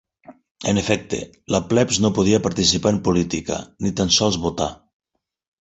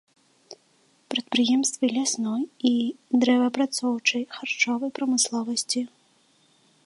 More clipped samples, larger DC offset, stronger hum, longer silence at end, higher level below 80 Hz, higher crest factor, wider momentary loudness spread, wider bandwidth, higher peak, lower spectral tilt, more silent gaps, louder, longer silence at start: neither; neither; neither; second, 0.85 s vs 1 s; first, -44 dBFS vs -80 dBFS; about the same, 18 dB vs 18 dB; first, 10 LU vs 7 LU; second, 8.2 kHz vs 11.5 kHz; first, -2 dBFS vs -8 dBFS; first, -4 dB/octave vs -2 dB/octave; first, 0.51-0.55 s vs none; first, -20 LUFS vs -24 LUFS; second, 0.3 s vs 0.5 s